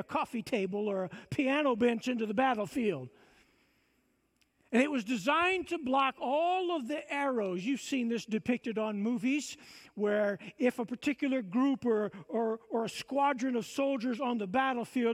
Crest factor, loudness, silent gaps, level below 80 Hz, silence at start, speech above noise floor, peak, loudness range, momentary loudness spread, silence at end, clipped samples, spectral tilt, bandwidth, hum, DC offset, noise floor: 18 dB; -32 LUFS; none; -72 dBFS; 0 s; 42 dB; -14 dBFS; 2 LU; 6 LU; 0 s; under 0.1%; -5 dB/octave; 14.5 kHz; none; under 0.1%; -74 dBFS